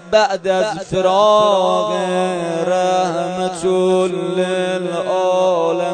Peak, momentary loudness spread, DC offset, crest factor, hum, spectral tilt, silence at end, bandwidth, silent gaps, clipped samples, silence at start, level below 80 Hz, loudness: -2 dBFS; 7 LU; under 0.1%; 14 dB; none; -5 dB/octave; 0 s; 9.4 kHz; none; under 0.1%; 0 s; -54 dBFS; -16 LUFS